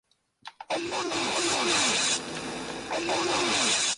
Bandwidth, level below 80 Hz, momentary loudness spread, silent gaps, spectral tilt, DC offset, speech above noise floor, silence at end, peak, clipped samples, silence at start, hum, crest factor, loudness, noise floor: 11.5 kHz; -62 dBFS; 12 LU; none; -1 dB/octave; under 0.1%; 24 dB; 0 s; -14 dBFS; under 0.1%; 0.45 s; none; 16 dB; -26 LUFS; -50 dBFS